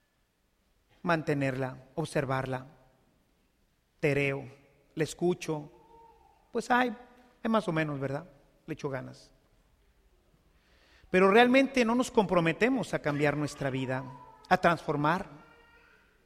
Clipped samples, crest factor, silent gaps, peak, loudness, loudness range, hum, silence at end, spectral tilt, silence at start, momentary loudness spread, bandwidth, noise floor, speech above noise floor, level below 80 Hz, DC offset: under 0.1%; 24 dB; none; -8 dBFS; -29 LUFS; 9 LU; none; 0.9 s; -6 dB/octave; 1.05 s; 14 LU; 15 kHz; -73 dBFS; 45 dB; -62 dBFS; under 0.1%